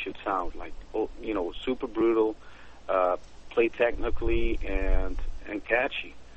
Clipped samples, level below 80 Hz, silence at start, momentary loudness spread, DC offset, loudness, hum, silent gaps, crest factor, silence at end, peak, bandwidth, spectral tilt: under 0.1%; -34 dBFS; 0 s; 12 LU; 0.5%; -29 LUFS; none; none; 18 dB; 0 s; -10 dBFS; 6.6 kHz; -7 dB/octave